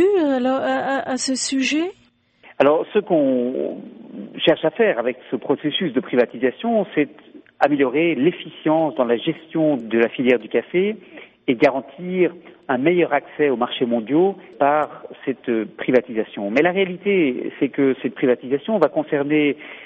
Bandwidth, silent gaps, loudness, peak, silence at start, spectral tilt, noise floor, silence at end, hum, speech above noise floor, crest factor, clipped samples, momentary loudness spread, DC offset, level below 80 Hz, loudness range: 8.4 kHz; none; -20 LUFS; -2 dBFS; 0 s; -5 dB/octave; -52 dBFS; 0 s; none; 33 dB; 18 dB; under 0.1%; 8 LU; under 0.1%; -66 dBFS; 1 LU